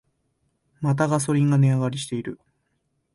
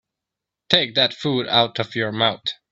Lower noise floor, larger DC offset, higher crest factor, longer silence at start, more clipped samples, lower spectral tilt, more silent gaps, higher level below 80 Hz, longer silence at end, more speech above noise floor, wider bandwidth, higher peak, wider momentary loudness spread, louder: second, -73 dBFS vs -85 dBFS; neither; second, 16 dB vs 22 dB; about the same, 0.8 s vs 0.7 s; neither; first, -6.5 dB/octave vs -5 dB/octave; neither; about the same, -62 dBFS vs -62 dBFS; first, 0.8 s vs 0.2 s; second, 51 dB vs 64 dB; first, 11.5 kHz vs 8.2 kHz; second, -8 dBFS vs 0 dBFS; first, 12 LU vs 7 LU; second, -22 LUFS vs -19 LUFS